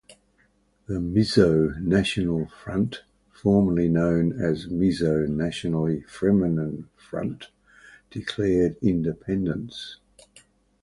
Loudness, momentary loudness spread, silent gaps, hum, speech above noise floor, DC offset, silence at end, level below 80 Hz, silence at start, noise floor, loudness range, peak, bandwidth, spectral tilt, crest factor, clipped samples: -24 LUFS; 13 LU; none; none; 41 dB; under 0.1%; 0.85 s; -46 dBFS; 0.1 s; -64 dBFS; 5 LU; -4 dBFS; 11.5 kHz; -7.5 dB/octave; 20 dB; under 0.1%